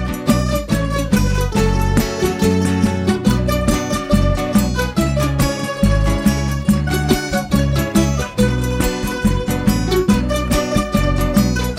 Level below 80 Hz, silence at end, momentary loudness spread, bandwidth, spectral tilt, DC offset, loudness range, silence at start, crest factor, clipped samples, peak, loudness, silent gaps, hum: -24 dBFS; 0 s; 3 LU; 16 kHz; -5.5 dB/octave; under 0.1%; 1 LU; 0 s; 14 dB; under 0.1%; -2 dBFS; -17 LUFS; none; none